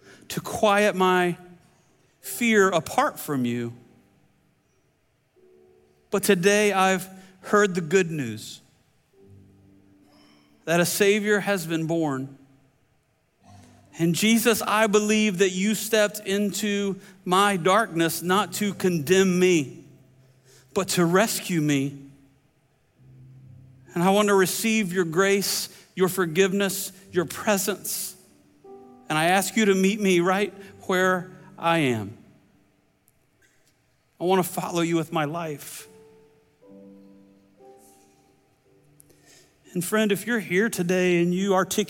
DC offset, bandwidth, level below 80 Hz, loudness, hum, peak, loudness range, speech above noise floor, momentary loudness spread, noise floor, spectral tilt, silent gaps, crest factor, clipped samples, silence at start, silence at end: under 0.1%; 17 kHz; -68 dBFS; -23 LUFS; none; -6 dBFS; 7 LU; 45 dB; 13 LU; -67 dBFS; -4.5 dB/octave; none; 18 dB; under 0.1%; 0.3 s; 0 s